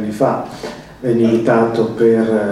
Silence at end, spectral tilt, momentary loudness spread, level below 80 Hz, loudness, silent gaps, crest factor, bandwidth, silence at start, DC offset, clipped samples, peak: 0 s; -7.5 dB/octave; 14 LU; -50 dBFS; -15 LUFS; none; 14 dB; 12.5 kHz; 0 s; under 0.1%; under 0.1%; 0 dBFS